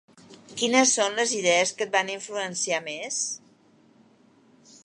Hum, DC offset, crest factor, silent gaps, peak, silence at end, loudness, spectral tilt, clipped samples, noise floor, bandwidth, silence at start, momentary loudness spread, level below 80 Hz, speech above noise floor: none; under 0.1%; 22 dB; none; -4 dBFS; 1.5 s; -24 LUFS; -1 dB/octave; under 0.1%; -59 dBFS; 11.5 kHz; 0.3 s; 11 LU; -80 dBFS; 34 dB